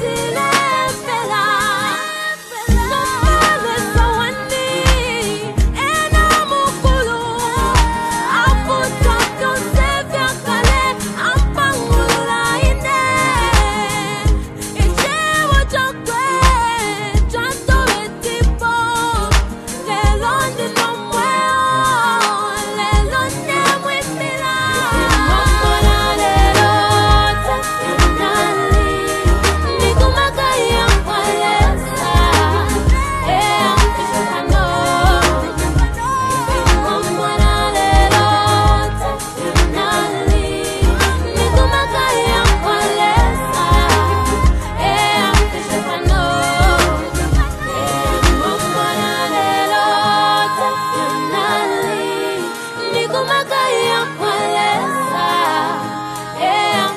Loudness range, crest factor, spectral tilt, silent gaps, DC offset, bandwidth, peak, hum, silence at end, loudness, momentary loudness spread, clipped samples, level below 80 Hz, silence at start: 2 LU; 14 dB; -4 dB/octave; none; under 0.1%; 13 kHz; 0 dBFS; none; 0 s; -15 LUFS; 6 LU; under 0.1%; -20 dBFS; 0 s